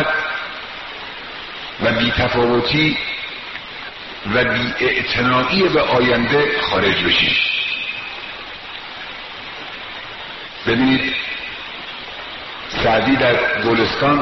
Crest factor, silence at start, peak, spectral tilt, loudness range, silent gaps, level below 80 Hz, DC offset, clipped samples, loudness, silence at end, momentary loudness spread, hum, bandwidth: 18 dB; 0 s; -2 dBFS; -2 dB/octave; 7 LU; none; -42 dBFS; 0.2%; under 0.1%; -17 LUFS; 0 s; 15 LU; none; 6.2 kHz